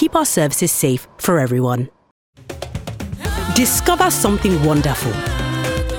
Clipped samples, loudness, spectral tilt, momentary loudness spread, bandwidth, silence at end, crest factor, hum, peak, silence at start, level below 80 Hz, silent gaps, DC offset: under 0.1%; -17 LUFS; -4.5 dB/octave; 14 LU; 18 kHz; 0 s; 16 dB; none; -2 dBFS; 0 s; -32 dBFS; 2.11-2.33 s; under 0.1%